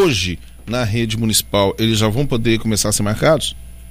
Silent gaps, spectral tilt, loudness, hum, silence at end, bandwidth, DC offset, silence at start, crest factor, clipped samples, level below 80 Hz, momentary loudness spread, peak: none; -4.5 dB/octave; -17 LUFS; none; 0 s; 15.5 kHz; under 0.1%; 0 s; 16 dB; under 0.1%; -34 dBFS; 8 LU; -2 dBFS